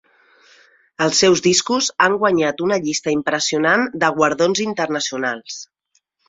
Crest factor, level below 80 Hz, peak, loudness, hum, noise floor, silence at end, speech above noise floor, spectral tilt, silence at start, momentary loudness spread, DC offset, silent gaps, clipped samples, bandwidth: 18 dB; -60 dBFS; -2 dBFS; -17 LUFS; none; -66 dBFS; 0.65 s; 49 dB; -3 dB/octave; 1 s; 8 LU; under 0.1%; none; under 0.1%; 8 kHz